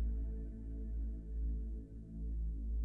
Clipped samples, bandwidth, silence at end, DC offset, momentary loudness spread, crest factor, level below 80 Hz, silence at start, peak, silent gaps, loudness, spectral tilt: under 0.1%; 0.9 kHz; 0 s; under 0.1%; 5 LU; 10 dB; -40 dBFS; 0 s; -30 dBFS; none; -44 LUFS; -11.5 dB/octave